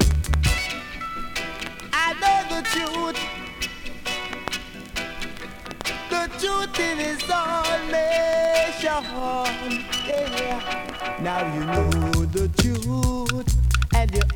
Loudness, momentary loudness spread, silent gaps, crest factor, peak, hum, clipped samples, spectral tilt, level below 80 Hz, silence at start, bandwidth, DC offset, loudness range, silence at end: -24 LUFS; 10 LU; none; 20 dB; -4 dBFS; none; under 0.1%; -4.5 dB/octave; -30 dBFS; 0 s; 19 kHz; under 0.1%; 5 LU; 0 s